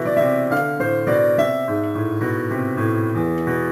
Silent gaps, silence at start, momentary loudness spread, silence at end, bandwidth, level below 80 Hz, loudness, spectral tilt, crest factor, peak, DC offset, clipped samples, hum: none; 0 s; 5 LU; 0 s; 15.5 kHz; -52 dBFS; -20 LUFS; -7.5 dB/octave; 14 dB; -6 dBFS; under 0.1%; under 0.1%; none